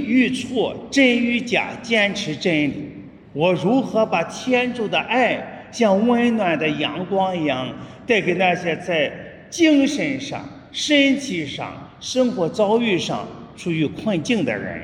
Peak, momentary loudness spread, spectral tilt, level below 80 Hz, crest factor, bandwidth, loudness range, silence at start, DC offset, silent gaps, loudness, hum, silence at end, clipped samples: -4 dBFS; 14 LU; -4.5 dB/octave; -58 dBFS; 16 dB; 11 kHz; 2 LU; 0 s; under 0.1%; none; -20 LUFS; none; 0 s; under 0.1%